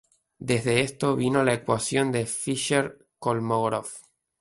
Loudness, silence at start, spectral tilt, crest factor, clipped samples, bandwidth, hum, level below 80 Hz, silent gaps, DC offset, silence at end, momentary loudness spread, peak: -25 LUFS; 0.4 s; -4.5 dB/octave; 18 dB; under 0.1%; 12 kHz; none; -60 dBFS; none; under 0.1%; 0.4 s; 10 LU; -8 dBFS